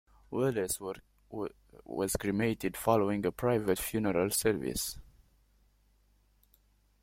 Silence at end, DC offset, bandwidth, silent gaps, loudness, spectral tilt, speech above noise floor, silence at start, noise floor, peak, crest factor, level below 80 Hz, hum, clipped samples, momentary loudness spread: 2 s; under 0.1%; 16.5 kHz; none; -32 LUFS; -4.5 dB/octave; 36 dB; 0.3 s; -68 dBFS; -12 dBFS; 22 dB; -56 dBFS; 50 Hz at -55 dBFS; under 0.1%; 13 LU